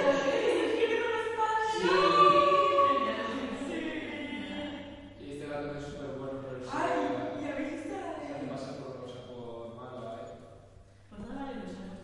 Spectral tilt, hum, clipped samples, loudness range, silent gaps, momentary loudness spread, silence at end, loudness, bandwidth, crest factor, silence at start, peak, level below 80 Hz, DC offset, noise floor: -5 dB/octave; none; under 0.1%; 16 LU; none; 19 LU; 0 s; -30 LUFS; 11.5 kHz; 20 dB; 0 s; -10 dBFS; -60 dBFS; under 0.1%; -55 dBFS